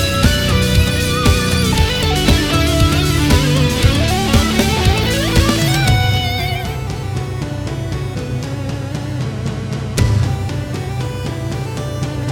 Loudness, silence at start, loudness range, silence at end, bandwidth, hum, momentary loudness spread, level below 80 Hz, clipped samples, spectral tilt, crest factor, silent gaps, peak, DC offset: -16 LUFS; 0 s; 7 LU; 0 s; 19.5 kHz; none; 9 LU; -22 dBFS; under 0.1%; -5 dB/octave; 14 dB; none; 0 dBFS; under 0.1%